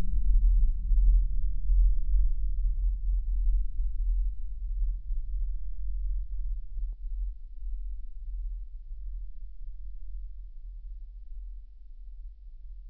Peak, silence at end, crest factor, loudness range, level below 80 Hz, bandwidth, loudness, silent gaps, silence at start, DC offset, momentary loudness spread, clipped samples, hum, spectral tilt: -12 dBFS; 0 s; 14 dB; 16 LU; -28 dBFS; 0.3 kHz; -34 LUFS; none; 0 s; under 0.1%; 19 LU; under 0.1%; none; -11 dB/octave